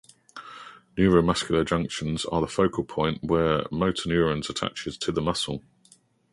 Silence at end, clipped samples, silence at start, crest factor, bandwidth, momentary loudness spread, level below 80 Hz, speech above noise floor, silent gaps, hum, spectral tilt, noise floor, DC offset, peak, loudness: 0.75 s; under 0.1%; 0.35 s; 20 dB; 11.5 kHz; 18 LU; -46 dBFS; 35 dB; none; none; -5.5 dB/octave; -60 dBFS; under 0.1%; -6 dBFS; -25 LUFS